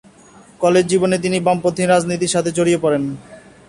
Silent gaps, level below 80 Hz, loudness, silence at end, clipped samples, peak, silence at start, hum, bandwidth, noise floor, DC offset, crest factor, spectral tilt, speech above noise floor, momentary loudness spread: none; -54 dBFS; -17 LUFS; 0.3 s; under 0.1%; -2 dBFS; 0.6 s; none; 11.5 kHz; -45 dBFS; under 0.1%; 16 dB; -5 dB/octave; 29 dB; 5 LU